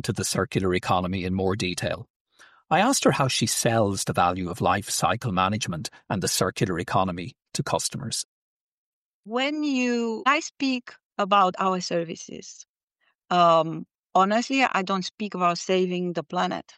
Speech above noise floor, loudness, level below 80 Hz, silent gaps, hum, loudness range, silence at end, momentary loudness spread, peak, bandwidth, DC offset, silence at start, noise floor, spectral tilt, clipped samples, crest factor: 48 dB; -24 LUFS; -58 dBFS; 2.10-2.25 s, 8.25-9.23 s, 11.04-11.11 s, 12.68-12.74 s, 12.83-12.88 s, 13.15-13.19 s, 13.99-14.03 s, 15.14-15.18 s; none; 4 LU; 0.15 s; 11 LU; -8 dBFS; 14.5 kHz; under 0.1%; 0.05 s; -72 dBFS; -4 dB/octave; under 0.1%; 18 dB